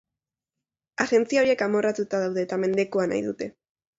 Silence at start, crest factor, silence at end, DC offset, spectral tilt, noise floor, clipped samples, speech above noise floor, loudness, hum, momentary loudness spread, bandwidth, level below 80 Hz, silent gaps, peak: 1 s; 20 dB; 0.5 s; under 0.1%; -5 dB/octave; -88 dBFS; under 0.1%; 65 dB; -24 LUFS; none; 11 LU; 8 kHz; -68 dBFS; none; -6 dBFS